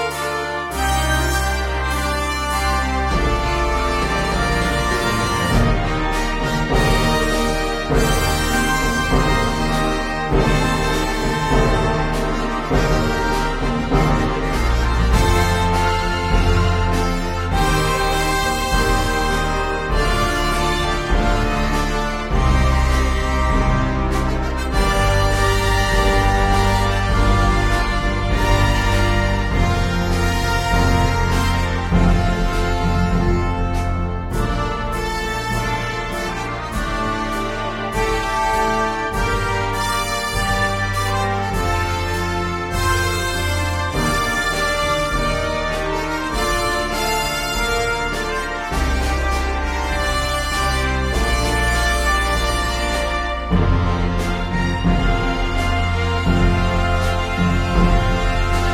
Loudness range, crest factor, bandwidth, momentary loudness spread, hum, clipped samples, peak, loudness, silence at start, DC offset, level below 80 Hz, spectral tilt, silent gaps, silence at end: 3 LU; 16 dB; 16.5 kHz; 5 LU; none; under 0.1%; -2 dBFS; -19 LUFS; 0 s; under 0.1%; -22 dBFS; -5 dB/octave; none; 0 s